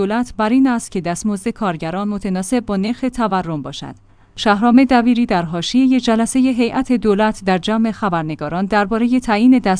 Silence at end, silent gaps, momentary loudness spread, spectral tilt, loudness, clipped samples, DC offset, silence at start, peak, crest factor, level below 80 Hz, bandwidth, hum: 0 s; none; 9 LU; -5.5 dB/octave; -16 LUFS; under 0.1%; under 0.1%; 0 s; 0 dBFS; 16 dB; -42 dBFS; 10.5 kHz; none